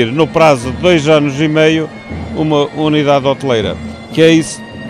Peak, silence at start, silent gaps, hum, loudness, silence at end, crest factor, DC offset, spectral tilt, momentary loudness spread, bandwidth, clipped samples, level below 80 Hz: 0 dBFS; 0 s; none; none; -12 LUFS; 0 s; 12 dB; under 0.1%; -5.5 dB/octave; 12 LU; 12 kHz; under 0.1%; -38 dBFS